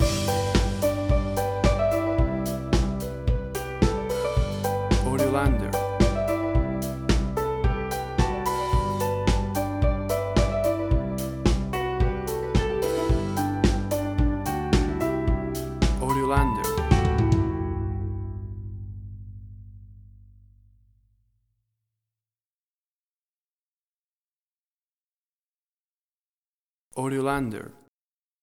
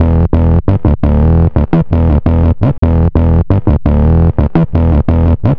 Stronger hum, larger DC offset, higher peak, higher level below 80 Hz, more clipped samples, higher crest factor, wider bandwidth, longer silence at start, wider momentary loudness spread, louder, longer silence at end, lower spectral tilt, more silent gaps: neither; second, under 0.1% vs 1%; second, -4 dBFS vs 0 dBFS; second, -30 dBFS vs -14 dBFS; neither; first, 22 dB vs 8 dB; first, over 20 kHz vs 3.8 kHz; about the same, 0 s vs 0 s; first, 9 LU vs 2 LU; second, -25 LUFS vs -11 LUFS; first, 0.7 s vs 0 s; second, -6.5 dB/octave vs -12 dB/octave; first, 22.45-26.91 s vs 2.78-2.82 s